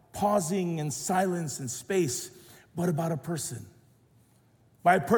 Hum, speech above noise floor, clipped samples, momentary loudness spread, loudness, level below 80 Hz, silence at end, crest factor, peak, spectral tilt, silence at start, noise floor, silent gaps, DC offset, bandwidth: none; 35 dB; under 0.1%; 10 LU; -29 LUFS; -64 dBFS; 0 s; 18 dB; -10 dBFS; -5 dB/octave; 0.15 s; -63 dBFS; none; under 0.1%; 18 kHz